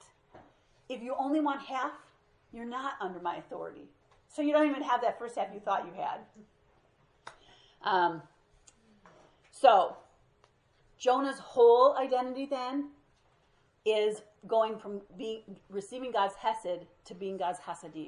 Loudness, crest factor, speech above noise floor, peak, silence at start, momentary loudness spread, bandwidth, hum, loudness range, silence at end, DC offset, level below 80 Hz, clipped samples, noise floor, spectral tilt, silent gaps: -31 LUFS; 24 dB; 38 dB; -8 dBFS; 0.35 s; 19 LU; 11 kHz; none; 9 LU; 0 s; under 0.1%; -74 dBFS; under 0.1%; -69 dBFS; -4.5 dB/octave; none